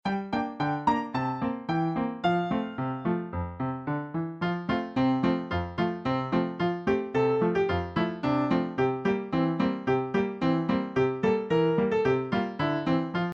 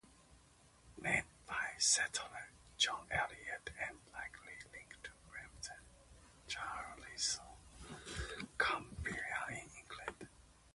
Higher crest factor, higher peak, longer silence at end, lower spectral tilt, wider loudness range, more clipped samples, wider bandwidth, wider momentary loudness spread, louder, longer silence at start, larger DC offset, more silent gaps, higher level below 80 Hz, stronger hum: second, 16 dB vs 26 dB; first, -12 dBFS vs -18 dBFS; about the same, 0 s vs 0.05 s; first, -8 dB/octave vs -1 dB/octave; second, 3 LU vs 11 LU; neither; second, 7.2 kHz vs 11.5 kHz; second, 6 LU vs 19 LU; first, -28 LUFS vs -40 LUFS; about the same, 0.05 s vs 0.05 s; neither; neither; first, -54 dBFS vs -62 dBFS; neither